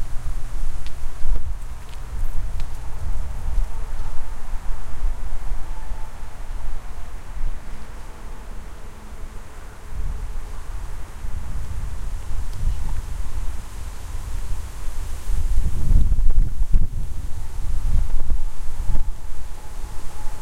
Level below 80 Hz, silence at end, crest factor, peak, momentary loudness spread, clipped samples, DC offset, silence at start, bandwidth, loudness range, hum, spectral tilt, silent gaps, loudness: -22 dBFS; 0 s; 16 dB; -2 dBFS; 13 LU; under 0.1%; under 0.1%; 0 s; 9 kHz; 11 LU; none; -5.5 dB/octave; none; -31 LUFS